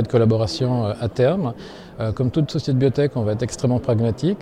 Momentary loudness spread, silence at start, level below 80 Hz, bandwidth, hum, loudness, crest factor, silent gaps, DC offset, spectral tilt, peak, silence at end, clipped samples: 9 LU; 0 s; -46 dBFS; 10.5 kHz; none; -21 LUFS; 14 dB; none; under 0.1%; -7.5 dB/octave; -6 dBFS; 0 s; under 0.1%